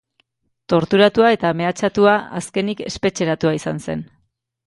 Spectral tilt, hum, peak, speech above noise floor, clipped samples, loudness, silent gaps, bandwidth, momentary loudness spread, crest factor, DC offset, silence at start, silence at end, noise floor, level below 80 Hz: -5.5 dB/octave; none; 0 dBFS; 50 dB; under 0.1%; -18 LUFS; none; 11.5 kHz; 11 LU; 18 dB; under 0.1%; 0.7 s; 0.6 s; -67 dBFS; -52 dBFS